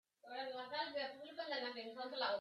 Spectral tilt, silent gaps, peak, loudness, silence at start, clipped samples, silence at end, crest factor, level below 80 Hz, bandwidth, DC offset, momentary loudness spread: -3.5 dB/octave; none; -26 dBFS; -45 LUFS; 0.25 s; under 0.1%; 0 s; 18 dB; under -90 dBFS; 12.5 kHz; under 0.1%; 6 LU